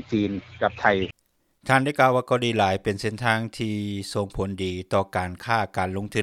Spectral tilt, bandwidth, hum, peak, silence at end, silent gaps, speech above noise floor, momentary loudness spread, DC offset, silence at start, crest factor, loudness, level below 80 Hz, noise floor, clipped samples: -5.5 dB/octave; 15 kHz; none; -2 dBFS; 0 s; none; 37 dB; 9 LU; under 0.1%; 0 s; 22 dB; -24 LUFS; -50 dBFS; -61 dBFS; under 0.1%